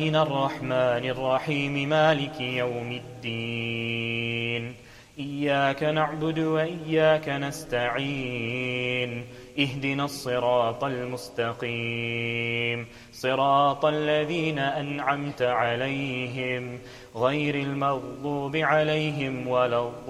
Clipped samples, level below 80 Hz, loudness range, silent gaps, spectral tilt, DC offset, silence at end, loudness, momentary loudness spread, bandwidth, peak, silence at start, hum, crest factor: under 0.1%; -58 dBFS; 3 LU; none; -6 dB/octave; under 0.1%; 0 s; -26 LUFS; 10 LU; 14 kHz; -8 dBFS; 0 s; none; 18 dB